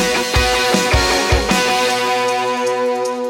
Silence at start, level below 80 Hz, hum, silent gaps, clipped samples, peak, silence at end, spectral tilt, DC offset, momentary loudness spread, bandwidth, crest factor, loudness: 0 s; -26 dBFS; none; none; under 0.1%; 0 dBFS; 0 s; -3.5 dB/octave; under 0.1%; 4 LU; 17 kHz; 16 dB; -15 LUFS